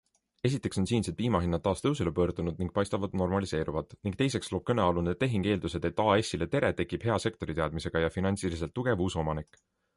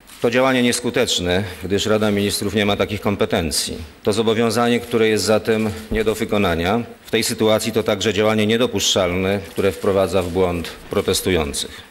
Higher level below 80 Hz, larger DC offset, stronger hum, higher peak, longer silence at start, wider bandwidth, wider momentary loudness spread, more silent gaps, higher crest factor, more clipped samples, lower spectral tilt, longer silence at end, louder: about the same, -46 dBFS vs -42 dBFS; neither; neither; second, -12 dBFS vs -6 dBFS; first, 0.45 s vs 0.1 s; second, 11.5 kHz vs 16.5 kHz; about the same, 5 LU vs 6 LU; neither; about the same, 18 dB vs 14 dB; neither; first, -6 dB/octave vs -4 dB/octave; first, 0.55 s vs 0.05 s; second, -30 LUFS vs -19 LUFS